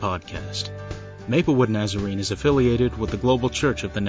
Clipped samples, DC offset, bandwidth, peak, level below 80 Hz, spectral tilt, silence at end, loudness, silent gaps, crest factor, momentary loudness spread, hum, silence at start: under 0.1%; under 0.1%; 8 kHz; -6 dBFS; -38 dBFS; -6 dB/octave; 0 s; -23 LUFS; none; 16 dB; 12 LU; none; 0 s